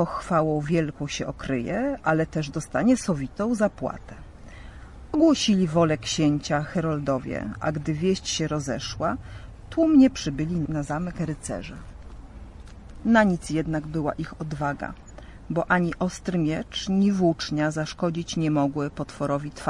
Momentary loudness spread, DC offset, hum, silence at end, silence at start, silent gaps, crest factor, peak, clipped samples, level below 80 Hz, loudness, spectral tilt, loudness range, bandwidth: 23 LU; under 0.1%; none; 0 s; 0 s; none; 18 dB; -8 dBFS; under 0.1%; -46 dBFS; -25 LUFS; -5.5 dB/octave; 3 LU; 11.5 kHz